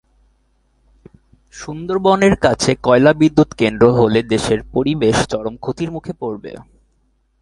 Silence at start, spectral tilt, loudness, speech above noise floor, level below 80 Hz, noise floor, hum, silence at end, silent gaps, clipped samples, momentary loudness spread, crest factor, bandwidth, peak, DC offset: 1.55 s; -5.5 dB/octave; -15 LUFS; 46 dB; -42 dBFS; -61 dBFS; none; 0.8 s; none; under 0.1%; 14 LU; 16 dB; 11.5 kHz; 0 dBFS; under 0.1%